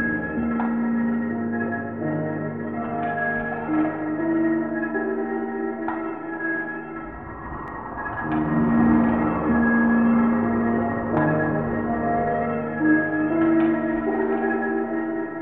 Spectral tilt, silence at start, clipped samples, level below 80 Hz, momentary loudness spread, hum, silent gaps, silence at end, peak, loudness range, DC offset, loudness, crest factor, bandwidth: -11 dB/octave; 0 s; under 0.1%; -46 dBFS; 10 LU; none; none; 0 s; -6 dBFS; 7 LU; 0.2%; -23 LUFS; 16 dB; 3.7 kHz